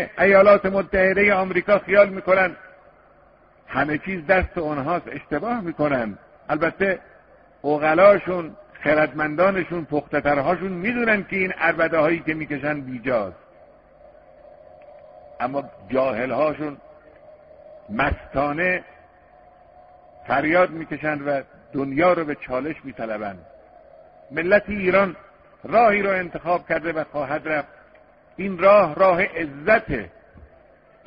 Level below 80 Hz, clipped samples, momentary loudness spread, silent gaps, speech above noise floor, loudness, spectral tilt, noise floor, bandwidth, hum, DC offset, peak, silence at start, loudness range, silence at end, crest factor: -48 dBFS; under 0.1%; 14 LU; none; 33 dB; -21 LUFS; -4.5 dB/octave; -54 dBFS; 5.2 kHz; none; under 0.1%; -2 dBFS; 0 s; 7 LU; 1 s; 20 dB